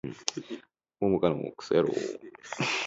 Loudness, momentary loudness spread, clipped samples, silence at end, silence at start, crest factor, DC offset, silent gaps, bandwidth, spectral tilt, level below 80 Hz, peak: -30 LUFS; 16 LU; under 0.1%; 0 s; 0.05 s; 24 dB; under 0.1%; none; 8 kHz; -4.5 dB/octave; -62 dBFS; -6 dBFS